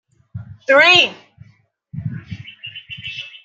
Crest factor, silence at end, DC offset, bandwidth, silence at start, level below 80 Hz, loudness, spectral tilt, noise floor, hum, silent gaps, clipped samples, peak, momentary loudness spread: 18 dB; 0.15 s; under 0.1%; 9 kHz; 0.35 s; -58 dBFS; -11 LUFS; -3.5 dB/octave; -54 dBFS; none; none; under 0.1%; 0 dBFS; 26 LU